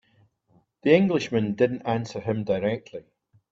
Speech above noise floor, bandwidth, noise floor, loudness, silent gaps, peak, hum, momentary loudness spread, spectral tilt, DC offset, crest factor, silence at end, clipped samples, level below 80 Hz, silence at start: 41 dB; 7.8 kHz; -64 dBFS; -24 LUFS; none; -6 dBFS; none; 12 LU; -7 dB/octave; under 0.1%; 20 dB; 0.5 s; under 0.1%; -64 dBFS; 0.85 s